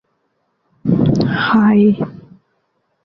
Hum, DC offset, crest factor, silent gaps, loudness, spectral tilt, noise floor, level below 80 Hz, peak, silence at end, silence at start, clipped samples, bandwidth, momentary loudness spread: none; under 0.1%; 14 dB; none; -14 LUFS; -8.5 dB/octave; -66 dBFS; -44 dBFS; -2 dBFS; 0.9 s; 0.85 s; under 0.1%; 6.6 kHz; 12 LU